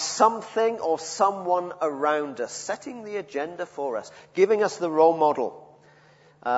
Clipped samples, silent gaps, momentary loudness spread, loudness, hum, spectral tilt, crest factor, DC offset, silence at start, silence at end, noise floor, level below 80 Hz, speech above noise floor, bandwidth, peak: under 0.1%; none; 13 LU; -25 LUFS; none; -3.5 dB/octave; 20 dB; under 0.1%; 0 s; 0 s; -56 dBFS; -74 dBFS; 31 dB; 8 kHz; -4 dBFS